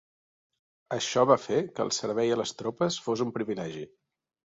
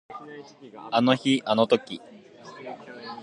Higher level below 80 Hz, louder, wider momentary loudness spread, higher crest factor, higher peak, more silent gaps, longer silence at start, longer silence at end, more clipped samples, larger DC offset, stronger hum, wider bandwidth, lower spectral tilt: about the same, -70 dBFS vs -74 dBFS; second, -28 LUFS vs -23 LUFS; second, 13 LU vs 22 LU; about the same, 22 dB vs 22 dB; second, -8 dBFS vs -4 dBFS; neither; first, 0.9 s vs 0.1 s; first, 0.75 s vs 0 s; neither; neither; neither; second, 7.8 kHz vs 10.5 kHz; about the same, -4.5 dB/octave vs -5.5 dB/octave